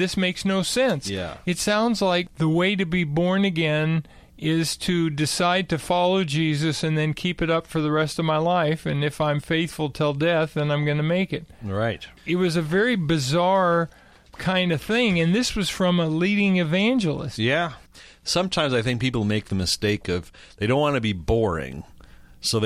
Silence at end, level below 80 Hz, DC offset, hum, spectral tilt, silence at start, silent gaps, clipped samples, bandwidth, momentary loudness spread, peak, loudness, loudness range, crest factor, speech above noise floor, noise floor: 0 s; -46 dBFS; under 0.1%; none; -5 dB/octave; 0 s; none; under 0.1%; 14.5 kHz; 7 LU; -8 dBFS; -23 LUFS; 2 LU; 14 dB; 24 dB; -47 dBFS